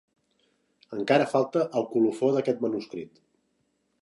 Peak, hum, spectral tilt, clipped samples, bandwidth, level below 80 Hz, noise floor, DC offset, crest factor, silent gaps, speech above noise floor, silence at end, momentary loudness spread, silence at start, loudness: -8 dBFS; none; -6.5 dB/octave; under 0.1%; 11.5 kHz; -76 dBFS; -73 dBFS; under 0.1%; 20 dB; none; 48 dB; 0.95 s; 16 LU; 0.9 s; -26 LUFS